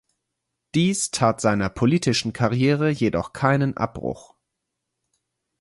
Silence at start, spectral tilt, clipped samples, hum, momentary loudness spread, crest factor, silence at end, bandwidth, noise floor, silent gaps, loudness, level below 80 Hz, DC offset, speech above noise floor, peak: 0.75 s; -5.5 dB/octave; under 0.1%; none; 7 LU; 18 dB; 1.4 s; 11.5 kHz; -81 dBFS; none; -22 LUFS; -50 dBFS; under 0.1%; 59 dB; -4 dBFS